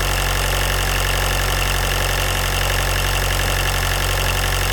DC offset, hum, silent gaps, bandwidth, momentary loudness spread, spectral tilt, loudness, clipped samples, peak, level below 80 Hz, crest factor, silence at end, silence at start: under 0.1%; none; none; 19 kHz; 0 LU; -2.5 dB/octave; -19 LUFS; under 0.1%; -6 dBFS; -24 dBFS; 14 dB; 0 s; 0 s